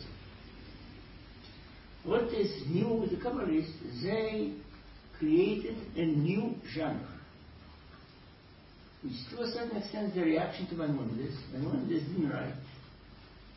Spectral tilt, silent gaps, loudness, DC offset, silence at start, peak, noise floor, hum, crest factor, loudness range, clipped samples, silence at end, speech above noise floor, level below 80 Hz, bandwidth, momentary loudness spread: -10.5 dB/octave; none; -34 LUFS; under 0.1%; 0 s; -16 dBFS; -56 dBFS; none; 18 dB; 6 LU; under 0.1%; 0 s; 23 dB; -56 dBFS; 5.8 kHz; 23 LU